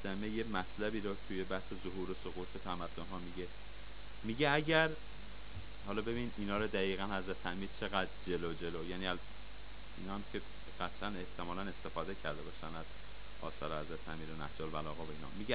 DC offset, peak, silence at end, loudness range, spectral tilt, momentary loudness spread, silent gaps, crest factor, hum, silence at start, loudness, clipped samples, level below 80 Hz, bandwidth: 0.8%; -16 dBFS; 0 s; 8 LU; -3.5 dB/octave; 15 LU; none; 26 dB; none; 0 s; -41 LUFS; under 0.1%; -54 dBFS; 5 kHz